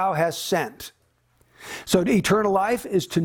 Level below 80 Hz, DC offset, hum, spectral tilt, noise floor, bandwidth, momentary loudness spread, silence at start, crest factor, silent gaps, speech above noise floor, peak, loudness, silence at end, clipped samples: -54 dBFS; under 0.1%; none; -5 dB/octave; -63 dBFS; 19.5 kHz; 19 LU; 0 s; 18 dB; none; 41 dB; -6 dBFS; -22 LUFS; 0 s; under 0.1%